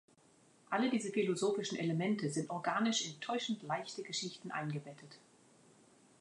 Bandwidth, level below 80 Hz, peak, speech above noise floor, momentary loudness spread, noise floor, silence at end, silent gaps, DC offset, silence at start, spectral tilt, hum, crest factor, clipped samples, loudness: 11 kHz; -86 dBFS; -22 dBFS; 30 dB; 8 LU; -67 dBFS; 1.05 s; none; under 0.1%; 0.7 s; -4.5 dB/octave; none; 18 dB; under 0.1%; -37 LUFS